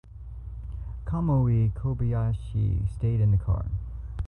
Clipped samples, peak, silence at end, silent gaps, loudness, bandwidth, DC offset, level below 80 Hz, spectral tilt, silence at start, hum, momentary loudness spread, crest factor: under 0.1%; -14 dBFS; 0 s; none; -27 LUFS; 4 kHz; under 0.1%; -34 dBFS; -11 dB/octave; 0.05 s; none; 16 LU; 12 dB